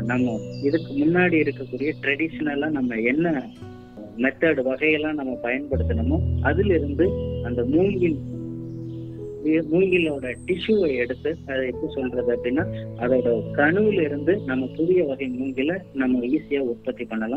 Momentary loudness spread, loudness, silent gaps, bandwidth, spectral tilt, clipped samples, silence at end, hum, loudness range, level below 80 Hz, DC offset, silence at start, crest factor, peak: 10 LU; -23 LUFS; none; 9 kHz; -8.5 dB/octave; under 0.1%; 0 s; none; 2 LU; -44 dBFS; under 0.1%; 0 s; 18 dB; -6 dBFS